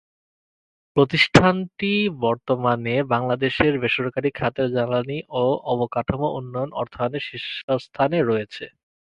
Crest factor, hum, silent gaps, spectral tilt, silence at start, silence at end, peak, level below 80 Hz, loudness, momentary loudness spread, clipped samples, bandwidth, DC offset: 22 dB; none; 7.64-7.68 s; -6 dB/octave; 0.95 s; 0.45 s; 0 dBFS; -50 dBFS; -22 LUFS; 11 LU; under 0.1%; 11 kHz; under 0.1%